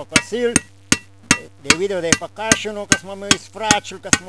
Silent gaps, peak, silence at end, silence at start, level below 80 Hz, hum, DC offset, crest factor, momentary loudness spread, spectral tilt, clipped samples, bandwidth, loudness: none; 0 dBFS; 0 s; 0 s; -44 dBFS; none; 0.4%; 20 dB; 3 LU; -2 dB/octave; 0.1%; 11 kHz; -18 LUFS